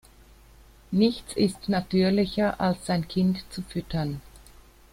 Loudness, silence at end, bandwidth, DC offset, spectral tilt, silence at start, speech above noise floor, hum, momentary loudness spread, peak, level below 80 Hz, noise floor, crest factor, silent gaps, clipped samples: -26 LUFS; 0.55 s; 15 kHz; under 0.1%; -6.5 dB/octave; 0.9 s; 27 dB; none; 10 LU; -8 dBFS; -50 dBFS; -52 dBFS; 18 dB; none; under 0.1%